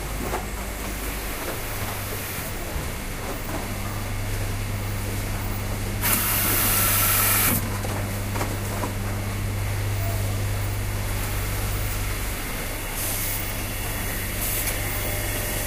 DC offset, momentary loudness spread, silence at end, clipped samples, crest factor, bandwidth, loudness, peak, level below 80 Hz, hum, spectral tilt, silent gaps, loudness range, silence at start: under 0.1%; 11 LU; 0 s; under 0.1%; 22 dB; 16 kHz; -25 LUFS; -4 dBFS; -32 dBFS; none; -3.5 dB/octave; none; 9 LU; 0 s